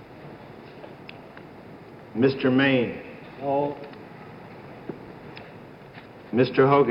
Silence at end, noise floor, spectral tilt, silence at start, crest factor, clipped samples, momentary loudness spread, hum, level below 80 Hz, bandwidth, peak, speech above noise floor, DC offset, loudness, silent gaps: 0 s; -45 dBFS; -8.5 dB/octave; 0 s; 20 dB; under 0.1%; 24 LU; none; -62 dBFS; 5.6 kHz; -6 dBFS; 23 dB; under 0.1%; -23 LUFS; none